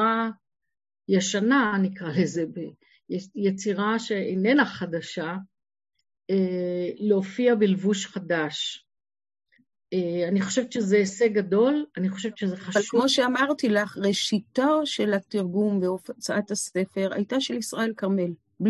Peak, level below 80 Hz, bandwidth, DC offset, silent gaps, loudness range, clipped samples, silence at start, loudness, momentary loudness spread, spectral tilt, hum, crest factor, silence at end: -8 dBFS; -70 dBFS; 12.5 kHz; under 0.1%; none; 3 LU; under 0.1%; 0 s; -25 LUFS; 10 LU; -5 dB/octave; none; 18 dB; 0 s